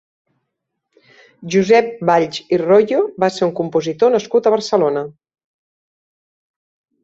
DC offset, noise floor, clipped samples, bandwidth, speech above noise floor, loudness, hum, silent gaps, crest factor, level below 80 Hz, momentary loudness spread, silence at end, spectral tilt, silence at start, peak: under 0.1%; -76 dBFS; under 0.1%; 8 kHz; 61 dB; -16 LUFS; none; none; 16 dB; -62 dBFS; 7 LU; 1.95 s; -5.5 dB/octave; 1.4 s; -2 dBFS